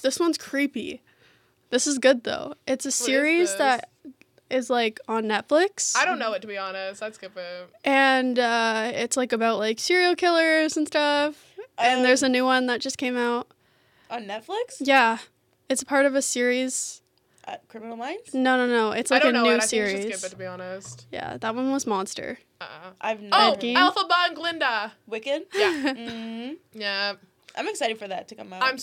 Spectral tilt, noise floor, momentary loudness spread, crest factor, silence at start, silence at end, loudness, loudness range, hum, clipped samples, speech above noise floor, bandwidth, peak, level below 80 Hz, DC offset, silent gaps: -2 dB/octave; -62 dBFS; 17 LU; 20 dB; 0 s; 0 s; -23 LUFS; 5 LU; none; under 0.1%; 38 dB; 16.5 kHz; -4 dBFS; -74 dBFS; under 0.1%; none